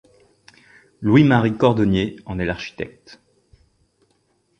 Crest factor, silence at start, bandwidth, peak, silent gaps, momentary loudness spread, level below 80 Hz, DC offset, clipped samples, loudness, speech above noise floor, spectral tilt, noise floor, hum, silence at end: 20 dB; 1 s; 8.6 kHz; -2 dBFS; none; 16 LU; -46 dBFS; under 0.1%; under 0.1%; -19 LUFS; 47 dB; -8 dB/octave; -65 dBFS; none; 1.7 s